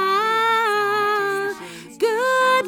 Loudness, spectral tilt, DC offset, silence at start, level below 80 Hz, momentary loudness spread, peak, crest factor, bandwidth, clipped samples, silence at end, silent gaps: -19 LUFS; -2.5 dB/octave; under 0.1%; 0 s; -72 dBFS; 10 LU; -8 dBFS; 12 dB; over 20 kHz; under 0.1%; 0 s; none